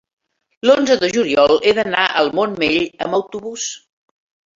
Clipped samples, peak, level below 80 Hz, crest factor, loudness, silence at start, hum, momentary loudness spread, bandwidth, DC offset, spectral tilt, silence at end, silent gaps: under 0.1%; -2 dBFS; -54 dBFS; 16 dB; -16 LUFS; 0.65 s; none; 12 LU; 7.8 kHz; under 0.1%; -3 dB/octave; 0.8 s; none